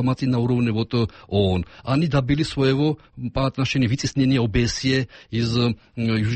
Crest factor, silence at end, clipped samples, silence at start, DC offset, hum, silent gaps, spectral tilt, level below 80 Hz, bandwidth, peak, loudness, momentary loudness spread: 14 dB; 0 s; under 0.1%; 0 s; under 0.1%; none; none; -6.5 dB/octave; -40 dBFS; 8.8 kHz; -8 dBFS; -22 LUFS; 5 LU